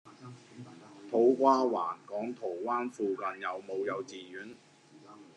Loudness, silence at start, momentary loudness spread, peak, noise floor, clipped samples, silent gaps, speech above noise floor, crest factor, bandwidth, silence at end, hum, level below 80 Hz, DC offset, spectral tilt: -31 LUFS; 0.05 s; 25 LU; -12 dBFS; -55 dBFS; under 0.1%; none; 24 dB; 20 dB; 10 kHz; 0.1 s; none; under -90 dBFS; under 0.1%; -6 dB/octave